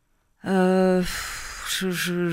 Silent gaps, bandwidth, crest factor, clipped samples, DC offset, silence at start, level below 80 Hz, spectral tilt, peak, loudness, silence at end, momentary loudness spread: none; 16 kHz; 16 dB; under 0.1%; under 0.1%; 0.45 s; -44 dBFS; -5 dB/octave; -8 dBFS; -24 LUFS; 0 s; 13 LU